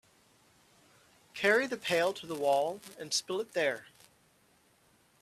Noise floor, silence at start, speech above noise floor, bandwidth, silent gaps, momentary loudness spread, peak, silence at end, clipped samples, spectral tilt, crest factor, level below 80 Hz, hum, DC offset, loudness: -67 dBFS; 1.35 s; 36 dB; 15 kHz; none; 11 LU; -12 dBFS; 1.4 s; under 0.1%; -2.5 dB/octave; 22 dB; -78 dBFS; none; under 0.1%; -31 LUFS